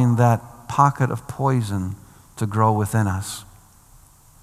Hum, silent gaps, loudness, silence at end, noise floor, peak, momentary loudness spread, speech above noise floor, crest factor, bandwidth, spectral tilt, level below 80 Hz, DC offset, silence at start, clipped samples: none; none; -21 LUFS; 1 s; -50 dBFS; -2 dBFS; 14 LU; 30 dB; 20 dB; 14.5 kHz; -7 dB/octave; -54 dBFS; under 0.1%; 0 s; under 0.1%